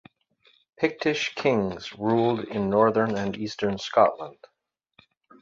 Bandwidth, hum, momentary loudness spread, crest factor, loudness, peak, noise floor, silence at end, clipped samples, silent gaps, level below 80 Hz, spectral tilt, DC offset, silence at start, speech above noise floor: 7.8 kHz; none; 9 LU; 20 dB; -25 LUFS; -6 dBFS; -78 dBFS; 1.1 s; under 0.1%; none; -60 dBFS; -6 dB/octave; under 0.1%; 0.8 s; 53 dB